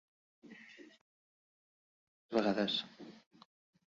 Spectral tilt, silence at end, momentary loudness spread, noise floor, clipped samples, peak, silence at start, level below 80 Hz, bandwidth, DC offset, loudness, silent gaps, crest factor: -3 dB/octave; 0.7 s; 24 LU; -57 dBFS; under 0.1%; -18 dBFS; 0.45 s; -80 dBFS; 7.4 kHz; under 0.1%; -35 LUFS; 1.01-2.29 s; 24 dB